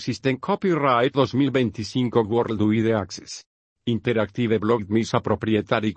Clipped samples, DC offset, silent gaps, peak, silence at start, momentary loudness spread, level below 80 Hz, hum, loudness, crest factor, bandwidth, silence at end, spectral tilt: under 0.1%; under 0.1%; 3.46-3.76 s; -4 dBFS; 0 s; 7 LU; -58 dBFS; none; -22 LUFS; 18 dB; 8.6 kHz; 0.05 s; -6.5 dB/octave